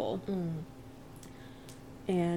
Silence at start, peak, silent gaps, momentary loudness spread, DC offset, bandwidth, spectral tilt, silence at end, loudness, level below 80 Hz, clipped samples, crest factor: 0 s; -20 dBFS; none; 16 LU; 0.1%; 16 kHz; -7.5 dB/octave; 0 s; -37 LUFS; -60 dBFS; under 0.1%; 16 dB